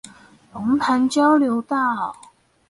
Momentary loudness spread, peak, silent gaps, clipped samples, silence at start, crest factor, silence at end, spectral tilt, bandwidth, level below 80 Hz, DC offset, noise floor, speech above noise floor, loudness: 12 LU; -6 dBFS; none; under 0.1%; 0.05 s; 14 dB; 0.55 s; -4.5 dB/octave; 11.5 kHz; -62 dBFS; under 0.1%; -46 dBFS; 27 dB; -20 LUFS